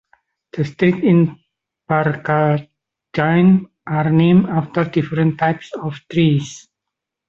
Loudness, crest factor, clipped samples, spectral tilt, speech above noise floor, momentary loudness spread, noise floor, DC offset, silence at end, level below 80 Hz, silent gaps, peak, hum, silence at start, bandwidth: -17 LUFS; 16 dB; under 0.1%; -8 dB/octave; 66 dB; 12 LU; -82 dBFS; under 0.1%; 0.7 s; -54 dBFS; none; -2 dBFS; none; 0.55 s; 7.6 kHz